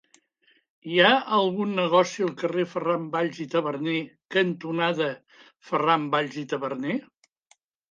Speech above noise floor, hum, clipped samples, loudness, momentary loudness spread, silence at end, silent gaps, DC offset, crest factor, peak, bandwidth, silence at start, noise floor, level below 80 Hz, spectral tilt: 41 dB; none; under 0.1%; -25 LUFS; 10 LU; 0.9 s; 4.25-4.29 s; under 0.1%; 22 dB; -4 dBFS; 7.6 kHz; 0.85 s; -66 dBFS; -78 dBFS; -5 dB/octave